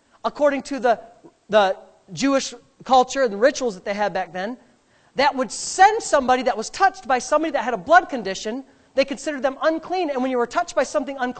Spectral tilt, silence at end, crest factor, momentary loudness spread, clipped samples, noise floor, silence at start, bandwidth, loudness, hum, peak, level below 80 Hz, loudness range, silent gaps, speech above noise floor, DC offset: -3 dB/octave; 0 s; 20 dB; 12 LU; under 0.1%; -58 dBFS; 0.25 s; 9 kHz; -21 LUFS; none; 0 dBFS; -54 dBFS; 3 LU; none; 37 dB; under 0.1%